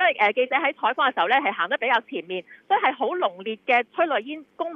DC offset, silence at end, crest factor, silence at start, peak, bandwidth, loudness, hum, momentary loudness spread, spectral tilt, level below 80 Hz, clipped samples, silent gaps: under 0.1%; 0 s; 16 dB; 0 s; -8 dBFS; 6.4 kHz; -23 LUFS; none; 11 LU; -5 dB/octave; -84 dBFS; under 0.1%; none